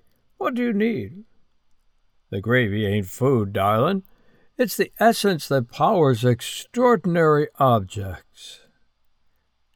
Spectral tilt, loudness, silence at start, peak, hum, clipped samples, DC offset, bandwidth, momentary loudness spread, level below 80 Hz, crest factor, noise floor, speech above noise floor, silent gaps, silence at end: -6 dB/octave; -21 LUFS; 0.4 s; -4 dBFS; none; under 0.1%; under 0.1%; over 20 kHz; 15 LU; -58 dBFS; 18 dB; -64 dBFS; 44 dB; none; 1.2 s